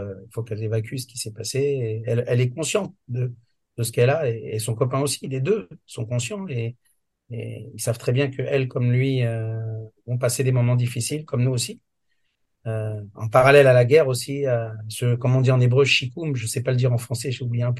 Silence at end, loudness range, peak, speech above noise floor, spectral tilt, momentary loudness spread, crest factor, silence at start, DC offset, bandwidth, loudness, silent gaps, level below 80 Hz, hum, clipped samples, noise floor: 0 s; 8 LU; -2 dBFS; 52 dB; -5.5 dB/octave; 14 LU; 20 dB; 0 s; under 0.1%; 12.5 kHz; -22 LUFS; none; -60 dBFS; none; under 0.1%; -74 dBFS